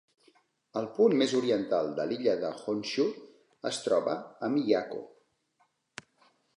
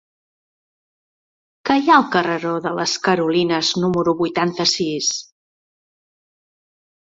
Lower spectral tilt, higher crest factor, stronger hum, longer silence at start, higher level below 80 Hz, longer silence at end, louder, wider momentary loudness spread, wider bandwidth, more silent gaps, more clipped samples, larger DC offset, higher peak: about the same, -5 dB/octave vs -4 dB/octave; about the same, 20 dB vs 20 dB; neither; second, 0.75 s vs 1.65 s; second, -78 dBFS vs -60 dBFS; second, 1.5 s vs 1.8 s; second, -30 LUFS vs -18 LUFS; first, 18 LU vs 8 LU; first, 11.5 kHz vs 7.8 kHz; neither; neither; neither; second, -12 dBFS vs -2 dBFS